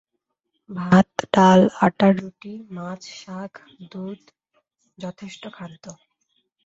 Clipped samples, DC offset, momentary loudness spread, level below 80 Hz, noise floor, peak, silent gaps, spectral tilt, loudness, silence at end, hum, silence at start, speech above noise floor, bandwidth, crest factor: under 0.1%; under 0.1%; 24 LU; -58 dBFS; -78 dBFS; -2 dBFS; none; -7 dB/octave; -17 LUFS; 0.75 s; none; 0.7 s; 57 dB; 7.8 kHz; 20 dB